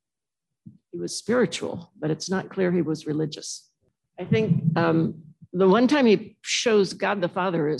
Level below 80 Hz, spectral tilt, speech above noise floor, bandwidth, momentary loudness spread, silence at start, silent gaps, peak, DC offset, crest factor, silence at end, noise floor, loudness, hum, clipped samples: -70 dBFS; -5.5 dB/octave; 67 dB; 12 kHz; 15 LU; 0.95 s; none; -8 dBFS; under 0.1%; 16 dB; 0 s; -90 dBFS; -24 LUFS; none; under 0.1%